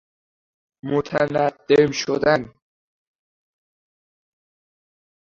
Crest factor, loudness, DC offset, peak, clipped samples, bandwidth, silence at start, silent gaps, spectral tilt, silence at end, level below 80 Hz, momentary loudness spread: 22 dB; -20 LUFS; under 0.1%; -2 dBFS; under 0.1%; 7.2 kHz; 0.85 s; none; -5 dB/octave; 2.8 s; -58 dBFS; 9 LU